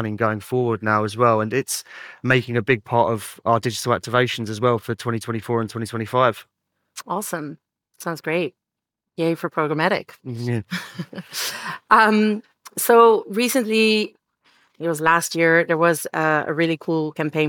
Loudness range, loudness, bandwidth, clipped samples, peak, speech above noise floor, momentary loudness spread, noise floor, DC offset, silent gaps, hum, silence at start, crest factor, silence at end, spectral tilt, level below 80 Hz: 8 LU; -20 LUFS; 19.5 kHz; under 0.1%; -4 dBFS; 64 dB; 14 LU; -84 dBFS; under 0.1%; none; none; 0 s; 18 dB; 0 s; -4.5 dB/octave; -66 dBFS